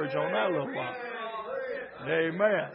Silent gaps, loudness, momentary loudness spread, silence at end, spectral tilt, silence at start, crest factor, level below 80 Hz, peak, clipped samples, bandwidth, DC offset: none; -31 LUFS; 10 LU; 0 s; -9.5 dB/octave; 0 s; 18 dB; -76 dBFS; -12 dBFS; under 0.1%; 5.6 kHz; under 0.1%